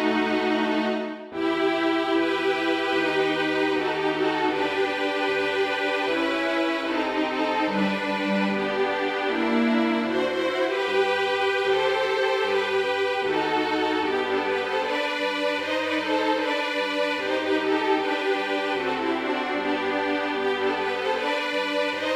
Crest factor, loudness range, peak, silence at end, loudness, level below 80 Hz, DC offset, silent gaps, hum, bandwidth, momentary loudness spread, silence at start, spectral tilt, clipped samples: 14 dB; 1 LU; -10 dBFS; 0 s; -24 LUFS; -62 dBFS; under 0.1%; none; none; 14 kHz; 3 LU; 0 s; -4.5 dB/octave; under 0.1%